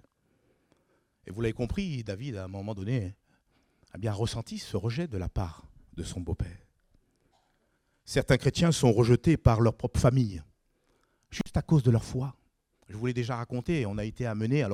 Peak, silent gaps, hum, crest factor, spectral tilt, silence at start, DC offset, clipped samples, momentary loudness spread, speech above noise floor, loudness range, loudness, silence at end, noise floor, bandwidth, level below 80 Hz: -8 dBFS; none; none; 22 dB; -6.5 dB/octave; 1.25 s; under 0.1%; under 0.1%; 15 LU; 45 dB; 10 LU; -29 LUFS; 0 s; -73 dBFS; 13.5 kHz; -46 dBFS